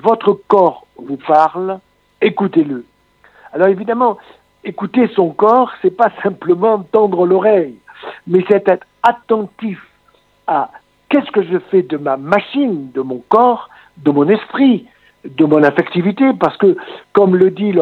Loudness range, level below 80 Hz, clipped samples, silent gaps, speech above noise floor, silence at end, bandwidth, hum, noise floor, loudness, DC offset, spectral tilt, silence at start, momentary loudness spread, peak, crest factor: 4 LU; -62 dBFS; under 0.1%; none; 41 dB; 0 s; 5.6 kHz; none; -54 dBFS; -14 LUFS; under 0.1%; -8.5 dB/octave; 0.05 s; 14 LU; 0 dBFS; 14 dB